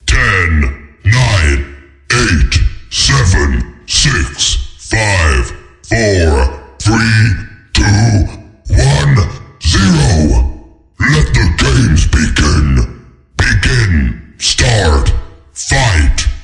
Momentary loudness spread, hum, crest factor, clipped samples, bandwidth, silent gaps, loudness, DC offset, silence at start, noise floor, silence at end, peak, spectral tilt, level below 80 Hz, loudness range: 9 LU; none; 10 dB; under 0.1%; 11 kHz; none; -11 LUFS; under 0.1%; 0.05 s; -34 dBFS; 0 s; 0 dBFS; -4.5 dB/octave; -16 dBFS; 1 LU